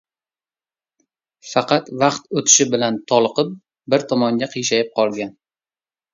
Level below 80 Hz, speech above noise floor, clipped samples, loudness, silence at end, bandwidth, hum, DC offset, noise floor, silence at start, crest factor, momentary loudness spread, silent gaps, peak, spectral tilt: -66 dBFS; over 72 dB; under 0.1%; -18 LUFS; 0.85 s; 7.8 kHz; none; under 0.1%; under -90 dBFS; 1.45 s; 20 dB; 10 LU; none; 0 dBFS; -3 dB/octave